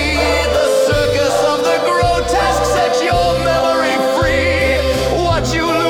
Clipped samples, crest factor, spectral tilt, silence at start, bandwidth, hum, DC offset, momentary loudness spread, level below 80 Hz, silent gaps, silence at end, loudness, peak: under 0.1%; 12 dB; -4.5 dB/octave; 0 s; 17.5 kHz; none; under 0.1%; 2 LU; -28 dBFS; none; 0 s; -14 LUFS; -2 dBFS